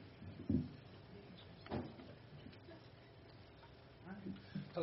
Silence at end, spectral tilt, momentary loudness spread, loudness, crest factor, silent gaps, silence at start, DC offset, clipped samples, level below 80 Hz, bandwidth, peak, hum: 0 s; -7 dB/octave; 19 LU; -49 LUFS; 24 dB; none; 0 s; under 0.1%; under 0.1%; -66 dBFS; 5.6 kHz; -24 dBFS; none